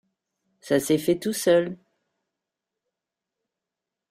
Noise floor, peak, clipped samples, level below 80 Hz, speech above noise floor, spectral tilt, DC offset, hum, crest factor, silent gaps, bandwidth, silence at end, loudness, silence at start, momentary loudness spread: -87 dBFS; -8 dBFS; under 0.1%; -68 dBFS; 65 dB; -4.5 dB/octave; under 0.1%; none; 20 dB; none; 15.5 kHz; 2.35 s; -23 LUFS; 0.65 s; 10 LU